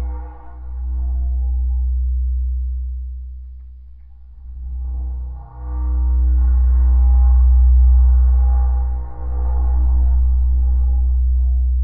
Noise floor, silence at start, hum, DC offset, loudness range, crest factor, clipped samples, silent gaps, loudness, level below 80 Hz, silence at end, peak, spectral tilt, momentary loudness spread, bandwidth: -38 dBFS; 0 s; none; under 0.1%; 12 LU; 10 dB; under 0.1%; none; -18 LUFS; -16 dBFS; 0 s; -6 dBFS; -13 dB/octave; 19 LU; 1.5 kHz